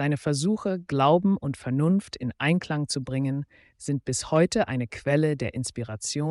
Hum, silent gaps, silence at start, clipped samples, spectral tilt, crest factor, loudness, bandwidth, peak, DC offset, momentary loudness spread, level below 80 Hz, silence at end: none; none; 0 s; under 0.1%; -5.5 dB/octave; 16 dB; -26 LUFS; 11.5 kHz; -10 dBFS; under 0.1%; 10 LU; -56 dBFS; 0 s